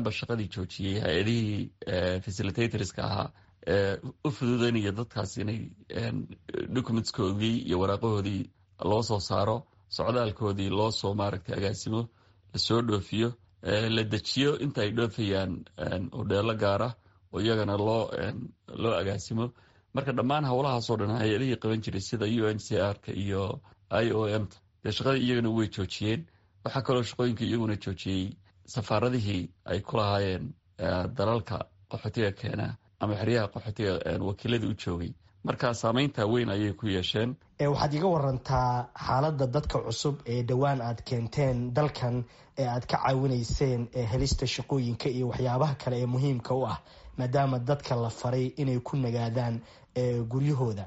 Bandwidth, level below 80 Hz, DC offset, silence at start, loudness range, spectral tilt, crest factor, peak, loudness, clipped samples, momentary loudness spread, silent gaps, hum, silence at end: 8 kHz; -50 dBFS; under 0.1%; 0 s; 3 LU; -5.5 dB/octave; 18 dB; -10 dBFS; -30 LUFS; under 0.1%; 8 LU; none; none; 0 s